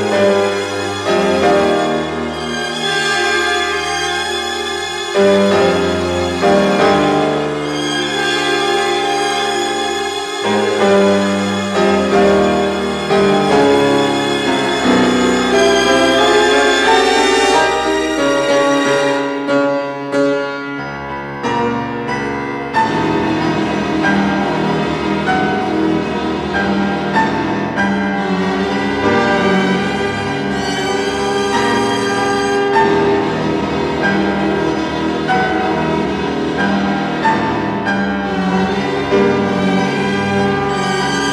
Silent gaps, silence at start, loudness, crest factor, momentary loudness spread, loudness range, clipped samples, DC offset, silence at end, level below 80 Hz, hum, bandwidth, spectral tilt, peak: none; 0 s; -15 LUFS; 14 dB; 7 LU; 4 LU; under 0.1%; under 0.1%; 0 s; -42 dBFS; none; 13.5 kHz; -4.5 dB/octave; 0 dBFS